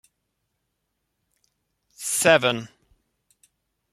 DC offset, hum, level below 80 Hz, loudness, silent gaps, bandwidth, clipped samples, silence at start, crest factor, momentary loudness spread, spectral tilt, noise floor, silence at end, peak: under 0.1%; none; -68 dBFS; -21 LUFS; none; 15 kHz; under 0.1%; 2 s; 26 dB; 17 LU; -2.5 dB/octave; -78 dBFS; 1.25 s; -2 dBFS